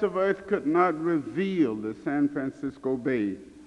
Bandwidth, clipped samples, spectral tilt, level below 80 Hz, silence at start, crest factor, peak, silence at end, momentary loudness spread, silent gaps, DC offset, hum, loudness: 10 kHz; under 0.1%; -8 dB/octave; -64 dBFS; 0 s; 16 dB; -10 dBFS; 0 s; 9 LU; none; under 0.1%; none; -27 LUFS